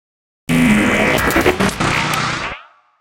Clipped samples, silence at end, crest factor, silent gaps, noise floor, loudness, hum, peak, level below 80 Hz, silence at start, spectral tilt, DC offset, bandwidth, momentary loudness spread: under 0.1%; 0.4 s; 16 dB; none; -35 dBFS; -15 LUFS; none; 0 dBFS; -34 dBFS; 0.5 s; -4.5 dB/octave; under 0.1%; 17 kHz; 12 LU